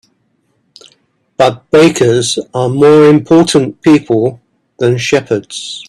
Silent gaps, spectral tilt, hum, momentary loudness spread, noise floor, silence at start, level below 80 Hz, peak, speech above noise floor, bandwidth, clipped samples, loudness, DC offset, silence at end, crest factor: none; -5.5 dB/octave; none; 10 LU; -60 dBFS; 1.4 s; -50 dBFS; 0 dBFS; 50 dB; 12.5 kHz; under 0.1%; -10 LUFS; under 0.1%; 0.05 s; 10 dB